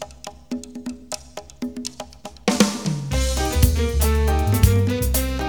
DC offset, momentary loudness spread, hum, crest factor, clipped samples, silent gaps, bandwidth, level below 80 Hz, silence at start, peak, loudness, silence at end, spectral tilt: 0.3%; 16 LU; none; 20 dB; under 0.1%; none; 19.5 kHz; -26 dBFS; 0 s; 0 dBFS; -21 LUFS; 0 s; -5 dB/octave